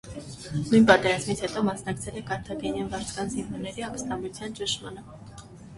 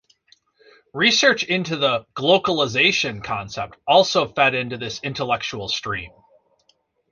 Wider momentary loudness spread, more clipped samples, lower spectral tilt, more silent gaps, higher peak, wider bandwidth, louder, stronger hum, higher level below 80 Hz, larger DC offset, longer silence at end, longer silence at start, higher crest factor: first, 21 LU vs 12 LU; neither; first, -4.5 dB/octave vs -3 dB/octave; neither; about the same, -2 dBFS vs -2 dBFS; first, 11.5 kHz vs 7.4 kHz; second, -27 LUFS vs -20 LUFS; neither; about the same, -52 dBFS vs -56 dBFS; neither; second, 0 s vs 1.05 s; second, 0.05 s vs 0.95 s; about the same, 24 dB vs 20 dB